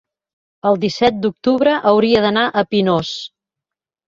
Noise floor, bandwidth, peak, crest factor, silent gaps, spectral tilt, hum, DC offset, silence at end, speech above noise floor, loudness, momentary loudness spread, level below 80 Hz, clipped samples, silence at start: -86 dBFS; 7.6 kHz; -2 dBFS; 16 dB; none; -6 dB/octave; none; under 0.1%; 0.85 s; 70 dB; -16 LUFS; 9 LU; -54 dBFS; under 0.1%; 0.65 s